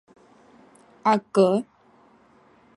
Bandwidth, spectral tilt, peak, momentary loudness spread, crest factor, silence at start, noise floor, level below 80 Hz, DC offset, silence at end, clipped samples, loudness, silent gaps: 11 kHz; -6.5 dB/octave; -6 dBFS; 9 LU; 20 dB; 1.05 s; -57 dBFS; -74 dBFS; under 0.1%; 1.15 s; under 0.1%; -22 LUFS; none